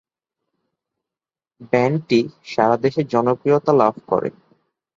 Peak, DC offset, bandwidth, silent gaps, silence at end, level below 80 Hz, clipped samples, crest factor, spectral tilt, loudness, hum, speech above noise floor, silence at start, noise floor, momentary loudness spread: -2 dBFS; under 0.1%; 7.4 kHz; none; 0.65 s; -62 dBFS; under 0.1%; 18 dB; -7.5 dB/octave; -19 LUFS; none; over 72 dB; 1.6 s; under -90 dBFS; 6 LU